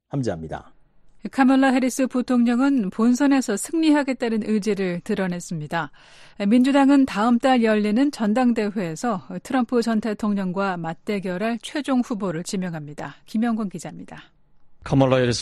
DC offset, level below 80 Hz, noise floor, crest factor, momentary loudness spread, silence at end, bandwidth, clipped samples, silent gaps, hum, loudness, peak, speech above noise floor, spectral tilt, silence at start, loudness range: under 0.1%; -54 dBFS; -50 dBFS; 18 dB; 13 LU; 0 s; 13 kHz; under 0.1%; none; none; -21 LUFS; -4 dBFS; 29 dB; -6 dB/octave; 0.15 s; 7 LU